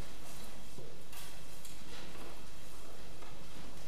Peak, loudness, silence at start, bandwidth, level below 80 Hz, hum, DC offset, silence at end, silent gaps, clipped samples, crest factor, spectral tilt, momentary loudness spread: -26 dBFS; -51 LUFS; 0 s; 15.5 kHz; -58 dBFS; none; 3%; 0 s; none; under 0.1%; 16 dB; -3.5 dB/octave; 3 LU